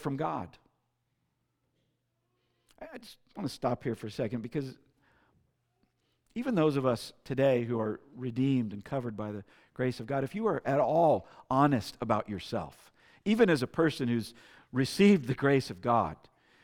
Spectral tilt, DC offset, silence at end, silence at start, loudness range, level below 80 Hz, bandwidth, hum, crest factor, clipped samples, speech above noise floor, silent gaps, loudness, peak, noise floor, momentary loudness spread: -7 dB/octave; under 0.1%; 0.5 s; 0 s; 10 LU; -64 dBFS; 16.5 kHz; none; 20 dB; under 0.1%; 49 dB; none; -30 LUFS; -10 dBFS; -79 dBFS; 17 LU